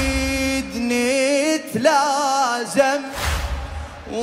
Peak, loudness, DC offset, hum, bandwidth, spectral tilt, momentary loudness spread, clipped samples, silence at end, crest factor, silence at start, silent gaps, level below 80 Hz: -4 dBFS; -20 LUFS; under 0.1%; none; 16 kHz; -3.5 dB/octave; 11 LU; under 0.1%; 0 s; 16 dB; 0 s; none; -32 dBFS